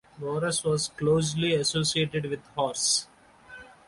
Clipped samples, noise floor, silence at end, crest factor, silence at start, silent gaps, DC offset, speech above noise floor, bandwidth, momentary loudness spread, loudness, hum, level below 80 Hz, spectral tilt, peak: under 0.1%; -49 dBFS; 0.15 s; 16 dB; 0.15 s; none; under 0.1%; 23 dB; 11.5 kHz; 9 LU; -26 LUFS; none; -58 dBFS; -3.5 dB/octave; -12 dBFS